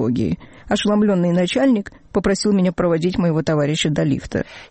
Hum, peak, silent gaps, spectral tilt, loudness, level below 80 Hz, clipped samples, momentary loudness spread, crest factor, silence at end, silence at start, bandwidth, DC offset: none; -8 dBFS; none; -6 dB/octave; -19 LUFS; -42 dBFS; under 0.1%; 7 LU; 10 dB; 0.05 s; 0 s; 8.8 kHz; under 0.1%